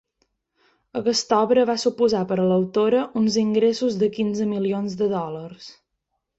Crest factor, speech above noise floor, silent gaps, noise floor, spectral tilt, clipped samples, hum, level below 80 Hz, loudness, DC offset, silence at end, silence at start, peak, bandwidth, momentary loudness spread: 16 dB; 57 dB; none; -78 dBFS; -5.5 dB/octave; under 0.1%; none; -64 dBFS; -21 LUFS; under 0.1%; 0.65 s; 0.95 s; -6 dBFS; 8.2 kHz; 9 LU